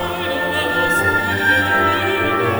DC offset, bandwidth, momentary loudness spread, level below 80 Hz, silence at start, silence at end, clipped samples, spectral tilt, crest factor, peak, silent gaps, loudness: under 0.1%; over 20 kHz; 5 LU; -46 dBFS; 0 s; 0 s; under 0.1%; -4.5 dB/octave; 14 dB; -4 dBFS; none; -16 LUFS